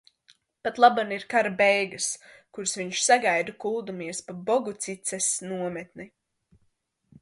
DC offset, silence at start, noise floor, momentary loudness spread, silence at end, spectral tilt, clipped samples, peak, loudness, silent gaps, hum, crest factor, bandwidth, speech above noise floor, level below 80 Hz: under 0.1%; 0.65 s; -72 dBFS; 14 LU; 1.15 s; -2 dB/octave; under 0.1%; -4 dBFS; -25 LUFS; none; none; 24 dB; 11.5 kHz; 46 dB; -72 dBFS